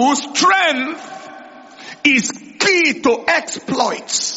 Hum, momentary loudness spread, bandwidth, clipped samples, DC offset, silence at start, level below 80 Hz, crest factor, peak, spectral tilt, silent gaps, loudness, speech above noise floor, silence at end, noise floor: none; 21 LU; 8.2 kHz; under 0.1%; under 0.1%; 0 s; -60 dBFS; 18 dB; 0 dBFS; -1.5 dB/octave; none; -15 LUFS; 21 dB; 0 s; -38 dBFS